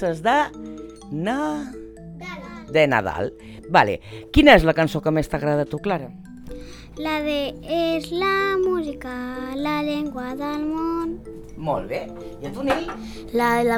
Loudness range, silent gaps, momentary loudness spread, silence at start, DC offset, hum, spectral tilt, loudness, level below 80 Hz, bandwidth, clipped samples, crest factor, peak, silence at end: 8 LU; none; 19 LU; 0 s; under 0.1%; none; -6 dB/octave; -22 LUFS; -38 dBFS; 18.5 kHz; under 0.1%; 22 dB; 0 dBFS; 0 s